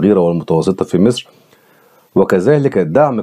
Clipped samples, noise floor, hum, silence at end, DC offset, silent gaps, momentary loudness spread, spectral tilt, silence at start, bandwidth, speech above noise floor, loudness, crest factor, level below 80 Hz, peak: under 0.1%; -49 dBFS; none; 0 s; under 0.1%; none; 4 LU; -7.5 dB/octave; 0 s; 14.5 kHz; 37 dB; -14 LUFS; 14 dB; -52 dBFS; 0 dBFS